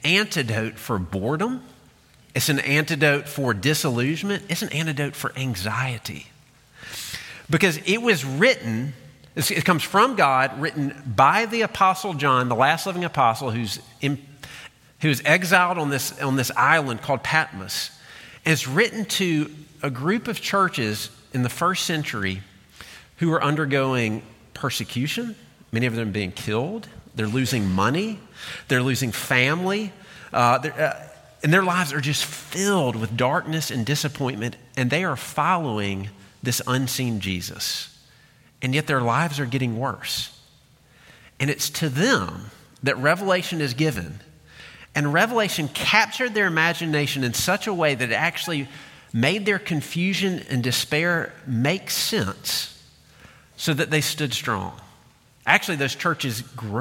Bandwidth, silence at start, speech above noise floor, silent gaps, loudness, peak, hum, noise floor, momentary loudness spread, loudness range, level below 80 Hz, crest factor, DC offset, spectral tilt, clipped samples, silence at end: 17 kHz; 0 s; 33 dB; none; -23 LUFS; 0 dBFS; none; -55 dBFS; 12 LU; 5 LU; -58 dBFS; 22 dB; under 0.1%; -4.5 dB/octave; under 0.1%; 0 s